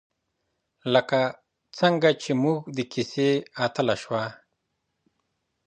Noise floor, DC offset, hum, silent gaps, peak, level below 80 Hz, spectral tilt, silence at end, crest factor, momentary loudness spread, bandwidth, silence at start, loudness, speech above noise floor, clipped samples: -78 dBFS; under 0.1%; none; none; -4 dBFS; -70 dBFS; -5.5 dB/octave; 1.3 s; 22 dB; 9 LU; 9.4 kHz; 0.85 s; -25 LUFS; 54 dB; under 0.1%